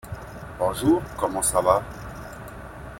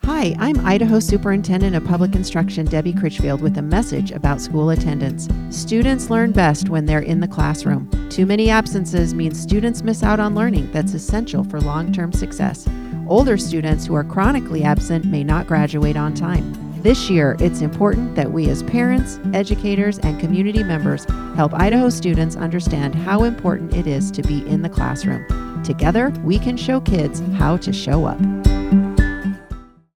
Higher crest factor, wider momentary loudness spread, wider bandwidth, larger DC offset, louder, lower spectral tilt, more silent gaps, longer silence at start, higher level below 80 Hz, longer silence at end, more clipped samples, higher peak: about the same, 22 dB vs 18 dB; first, 18 LU vs 6 LU; first, 16.5 kHz vs 14 kHz; neither; second, -23 LUFS vs -18 LUFS; second, -4.5 dB/octave vs -6.5 dB/octave; neither; about the same, 0.05 s vs 0.05 s; second, -44 dBFS vs -26 dBFS; second, 0 s vs 0.35 s; neither; second, -4 dBFS vs 0 dBFS